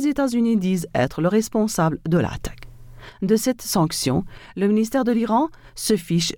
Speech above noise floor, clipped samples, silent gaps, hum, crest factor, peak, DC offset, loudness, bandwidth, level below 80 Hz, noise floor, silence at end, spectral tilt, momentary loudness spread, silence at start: 20 dB; under 0.1%; none; none; 14 dB; -6 dBFS; under 0.1%; -21 LUFS; 19 kHz; -46 dBFS; -41 dBFS; 0 s; -5.5 dB/octave; 8 LU; 0 s